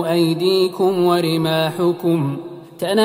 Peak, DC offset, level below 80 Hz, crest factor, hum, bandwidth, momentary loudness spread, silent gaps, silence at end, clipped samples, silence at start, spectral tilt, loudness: -4 dBFS; under 0.1%; -64 dBFS; 14 dB; none; 16 kHz; 9 LU; none; 0 s; under 0.1%; 0 s; -6 dB/octave; -18 LUFS